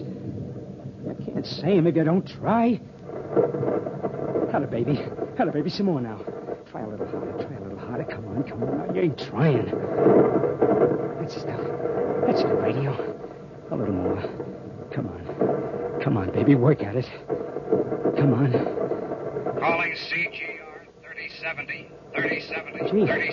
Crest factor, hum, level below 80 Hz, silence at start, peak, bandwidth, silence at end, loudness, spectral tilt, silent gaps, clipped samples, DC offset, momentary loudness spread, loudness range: 20 dB; none; -58 dBFS; 0 s; -6 dBFS; 7 kHz; 0 s; -25 LUFS; -8.5 dB/octave; none; under 0.1%; under 0.1%; 14 LU; 6 LU